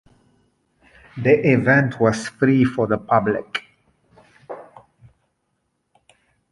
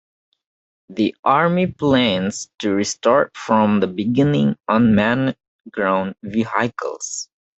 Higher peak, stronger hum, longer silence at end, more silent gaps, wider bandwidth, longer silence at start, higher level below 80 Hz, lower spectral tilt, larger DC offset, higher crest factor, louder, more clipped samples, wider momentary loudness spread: about the same, -2 dBFS vs -2 dBFS; neither; first, 1.9 s vs 0.35 s; second, none vs 1.19-1.23 s, 5.48-5.59 s; first, 11.5 kHz vs 8.2 kHz; first, 1.15 s vs 0.9 s; about the same, -56 dBFS vs -54 dBFS; first, -7 dB/octave vs -5.5 dB/octave; neither; about the same, 20 dB vs 18 dB; about the same, -19 LUFS vs -19 LUFS; neither; first, 22 LU vs 10 LU